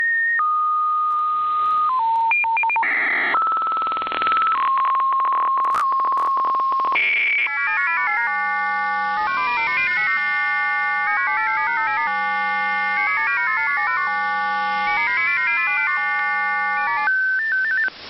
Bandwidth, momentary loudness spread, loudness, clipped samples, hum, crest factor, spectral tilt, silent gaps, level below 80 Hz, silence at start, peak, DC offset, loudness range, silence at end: 7.6 kHz; 3 LU; -19 LUFS; under 0.1%; none; 16 dB; 2 dB/octave; none; -64 dBFS; 0 s; -4 dBFS; under 0.1%; 1 LU; 0 s